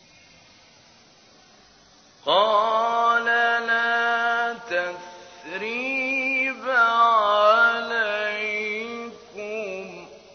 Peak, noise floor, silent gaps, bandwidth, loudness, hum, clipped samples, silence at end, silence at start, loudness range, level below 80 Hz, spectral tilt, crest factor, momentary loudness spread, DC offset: -6 dBFS; -54 dBFS; none; 6.6 kHz; -21 LUFS; none; under 0.1%; 0.15 s; 2.25 s; 3 LU; -70 dBFS; -2.5 dB/octave; 18 dB; 18 LU; under 0.1%